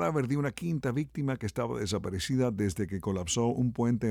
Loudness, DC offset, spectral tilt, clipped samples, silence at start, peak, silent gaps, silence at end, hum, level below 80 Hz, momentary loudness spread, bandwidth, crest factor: -31 LUFS; under 0.1%; -6 dB/octave; under 0.1%; 0 s; -16 dBFS; none; 0 s; none; -54 dBFS; 4 LU; 16 kHz; 14 dB